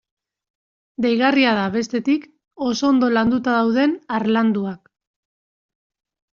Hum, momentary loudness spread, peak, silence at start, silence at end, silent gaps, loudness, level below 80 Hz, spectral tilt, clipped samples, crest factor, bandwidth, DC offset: none; 8 LU; -4 dBFS; 1 s; 1.6 s; none; -19 LUFS; -60 dBFS; -3.5 dB/octave; under 0.1%; 18 dB; 7.2 kHz; under 0.1%